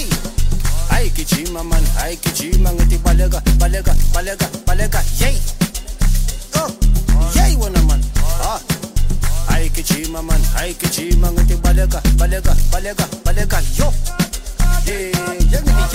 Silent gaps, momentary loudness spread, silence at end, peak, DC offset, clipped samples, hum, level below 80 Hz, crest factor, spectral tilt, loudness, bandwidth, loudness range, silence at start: none; 5 LU; 0 s; -2 dBFS; under 0.1%; under 0.1%; none; -14 dBFS; 12 dB; -4.5 dB/octave; -18 LUFS; 16.5 kHz; 2 LU; 0 s